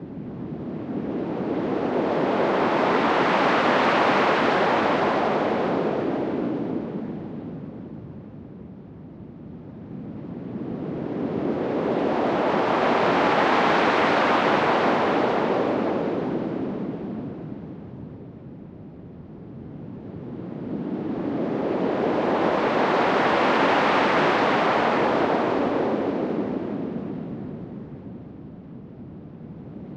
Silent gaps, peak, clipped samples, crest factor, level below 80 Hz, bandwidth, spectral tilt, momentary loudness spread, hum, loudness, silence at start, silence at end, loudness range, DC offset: none; -8 dBFS; under 0.1%; 16 dB; -56 dBFS; 9.4 kHz; -6.5 dB/octave; 21 LU; none; -23 LUFS; 0 s; 0 s; 16 LU; under 0.1%